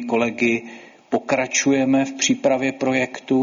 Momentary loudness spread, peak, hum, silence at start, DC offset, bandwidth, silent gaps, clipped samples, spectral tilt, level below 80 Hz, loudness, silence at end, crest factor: 8 LU; -4 dBFS; none; 0 s; under 0.1%; 7.6 kHz; none; under 0.1%; -3.5 dB/octave; -62 dBFS; -20 LUFS; 0 s; 16 dB